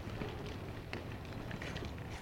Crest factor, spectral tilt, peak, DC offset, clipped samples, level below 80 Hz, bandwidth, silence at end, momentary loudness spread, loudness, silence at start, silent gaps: 22 dB; -6 dB/octave; -22 dBFS; under 0.1%; under 0.1%; -52 dBFS; 16 kHz; 0 s; 3 LU; -44 LUFS; 0 s; none